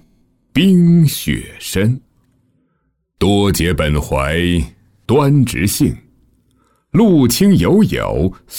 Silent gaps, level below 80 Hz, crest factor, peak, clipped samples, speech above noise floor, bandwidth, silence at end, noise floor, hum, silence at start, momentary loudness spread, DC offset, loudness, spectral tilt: none; -32 dBFS; 12 dB; -2 dBFS; under 0.1%; 52 dB; 18 kHz; 0 s; -65 dBFS; none; 0.55 s; 10 LU; under 0.1%; -14 LUFS; -6 dB/octave